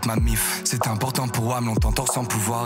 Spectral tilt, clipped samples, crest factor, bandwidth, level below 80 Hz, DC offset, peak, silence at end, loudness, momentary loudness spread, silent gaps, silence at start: -4 dB/octave; under 0.1%; 16 dB; 16.5 kHz; -30 dBFS; under 0.1%; -6 dBFS; 0 s; -23 LUFS; 2 LU; none; 0 s